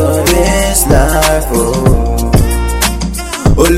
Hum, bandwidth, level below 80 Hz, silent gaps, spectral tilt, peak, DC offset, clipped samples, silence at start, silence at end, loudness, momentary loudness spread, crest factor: none; 16.5 kHz; -14 dBFS; none; -4.5 dB/octave; 0 dBFS; under 0.1%; 0.6%; 0 s; 0 s; -11 LUFS; 5 LU; 10 dB